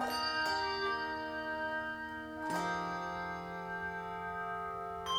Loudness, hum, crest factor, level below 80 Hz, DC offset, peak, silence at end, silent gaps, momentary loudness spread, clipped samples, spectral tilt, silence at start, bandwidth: -37 LUFS; none; 16 dB; -62 dBFS; under 0.1%; -22 dBFS; 0 s; none; 8 LU; under 0.1%; -3.5 dB/octave; 0 s; 19.5 kHz